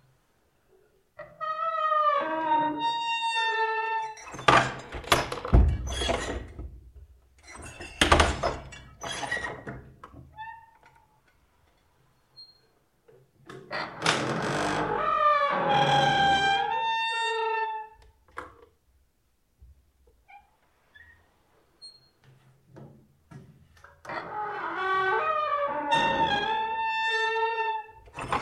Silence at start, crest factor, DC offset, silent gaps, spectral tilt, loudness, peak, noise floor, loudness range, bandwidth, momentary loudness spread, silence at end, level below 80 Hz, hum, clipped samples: 1.2 s; 26 dB; under 0.1%; none; -4 dB/octave; -26 LUFS; -2 dBFS; -71 dBFS; 14 LU; 13 kHz; 22 LU; 0 s; -40 dBFS; none; under 0.1%